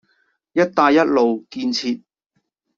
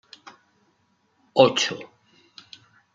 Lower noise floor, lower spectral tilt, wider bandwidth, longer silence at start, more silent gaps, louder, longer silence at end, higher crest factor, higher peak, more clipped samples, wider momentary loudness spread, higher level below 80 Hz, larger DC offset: first, -72 dBFS vs -67 dBFS; first, -5 dB/octave vs -3.5 dB/octave; about the same, 7.6 kHz vs 7.6 kHz; second, 0.55 s vs 1.35 s; neither; about the same, -18 LUFS vs -20 LUFS; second, 0.8 s vs 1.1 s; second, 18 dB vs 26 dB; about the same, -2 dBFS vs -2 dBFS; neither; second, 11 LU vs 27 LU; first, -64 dBFS vs -74 dBFS; neither